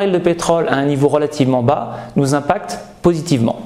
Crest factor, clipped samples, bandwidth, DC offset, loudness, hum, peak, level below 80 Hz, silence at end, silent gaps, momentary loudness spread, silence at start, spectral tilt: 16 dB; under 0.1%; 14.5 kHz; 0.2%; -16 LUFS; none; 0 dBFS; -44 dBFS; 0 s; none; 6 LU; 0 s; -6.5 dB/octave